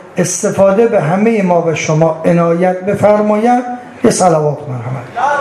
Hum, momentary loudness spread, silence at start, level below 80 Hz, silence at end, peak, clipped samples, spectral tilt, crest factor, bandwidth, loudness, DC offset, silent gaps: none; 7 LU; 0 s; -50 dBFS; 0 s; 0 dBFS; under 0.1%; -6 dB/octave; 12 dB; 13 kHz; -12 LUFS; under 0.1%; none